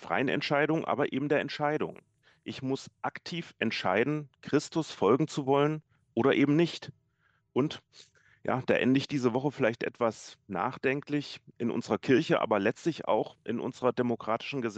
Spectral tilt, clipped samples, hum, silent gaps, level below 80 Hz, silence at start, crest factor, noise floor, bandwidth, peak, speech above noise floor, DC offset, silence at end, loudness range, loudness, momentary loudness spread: -6 dB/octave; under 0.1%; none; none; -72 dBFS; 0 s; 20 dB; -72 dBFS; 8.6 kHz; -10 dBFS; 43 dB; under 0.1%; 0 s; 3 LU; -30 LUFS; 12 LU